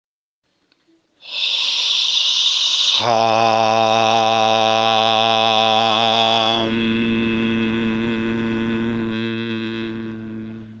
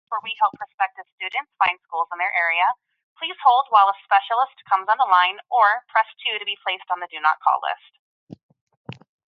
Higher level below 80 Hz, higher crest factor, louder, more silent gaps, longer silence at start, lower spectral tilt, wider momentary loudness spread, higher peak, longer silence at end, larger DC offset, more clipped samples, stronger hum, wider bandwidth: first, -50 dBFS vs -74 dBFS; about the same, 18 dB vs 20 dB; first, -16 LUFS vs -21 LUFS; second, none vs 0.74-0.78 s, 1.12-1.18 s, 3.04-3.16 s, 7.99-8.27 s, 8.43-8.49 s, 8.61-8.67 s, 8.77-8.85 s; first, 1.25 s vs 0.1 s; about the same, -3.5 dB/octave vs -4 dB/octave; about the same, 10 LU vs 12 LU; first, 0 dBFS vs -4 dBFS; second, 0 s vs 0.45 s; neither; neither; neither; first, 9.4 kHz vs 5.4 kHz